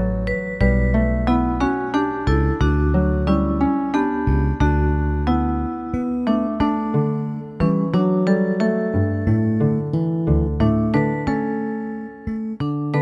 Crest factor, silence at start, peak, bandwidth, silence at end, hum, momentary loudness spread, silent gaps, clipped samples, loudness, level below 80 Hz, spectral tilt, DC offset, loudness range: 14 dB; 0 s; -4 dBFS; 7.4 kHz; 0 s; none; 7 LU; none; under 0.1%; -20 LUFS; -26 dBFS; -9 dB/octave; under 0.1%; 2 LU